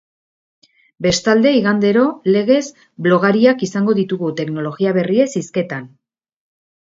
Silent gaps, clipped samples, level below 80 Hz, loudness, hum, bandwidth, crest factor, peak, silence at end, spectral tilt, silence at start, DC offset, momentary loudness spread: none; under 0.1%; -56 dBFS; -16 LUFS; none; 7.8 kHz; 16 dB; 0 dBFS; 1 s; -5.5 dB/octave; 1 s; under 0.1%; 9 LU